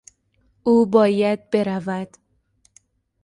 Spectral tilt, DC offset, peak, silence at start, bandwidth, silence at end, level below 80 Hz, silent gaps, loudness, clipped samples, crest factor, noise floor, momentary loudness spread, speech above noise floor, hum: -7 dB/octave; under 0.1%; -4 dBFS; 0.65 s; 11 kHz; 1.15 s; -62 dBFS; none; -20 LUFS; under 0.1%; 18 dB; -64 dBFS; 13 LU; 45 dB; none